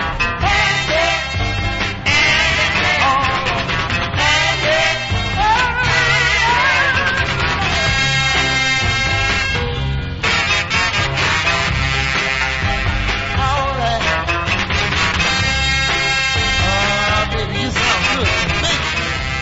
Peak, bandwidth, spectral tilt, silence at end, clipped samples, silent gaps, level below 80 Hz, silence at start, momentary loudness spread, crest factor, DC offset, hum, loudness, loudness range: -2 dBFS; 8 kHz; -3 dB/octave; 0 s; under 0.1%; none; -28 dBFS; 0 s; 5 LU; 14 dB; under 0.1%; none; -15 LUFS; 2 LU